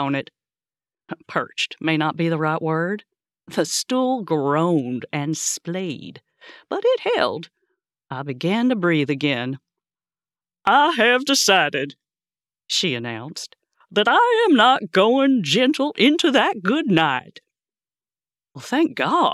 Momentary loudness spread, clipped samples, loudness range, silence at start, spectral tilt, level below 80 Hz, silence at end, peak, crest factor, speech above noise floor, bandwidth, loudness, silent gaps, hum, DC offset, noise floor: 15 LU; under 0.1%; 7 LU; 0 s; -4 dB/octave; -72 dBFS; 0 s; -4 dBFS; 18 dB; over 70 dB; 14.5 kHz; -20 LUFS; none; none; under 0.1%; under -90 dBFS